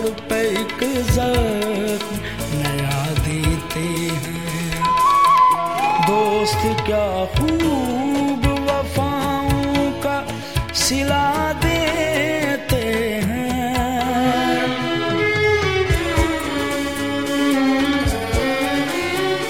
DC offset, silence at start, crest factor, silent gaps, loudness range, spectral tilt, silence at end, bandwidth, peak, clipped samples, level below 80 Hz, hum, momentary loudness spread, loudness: 0.7%; 0 s; 14 dB; none; 4 LU; -5 dB/octave; 0 s; 17 kHz; -4 dBFS; under 0.1%; -32 dBFS; none; 6 LU; -19 LUFS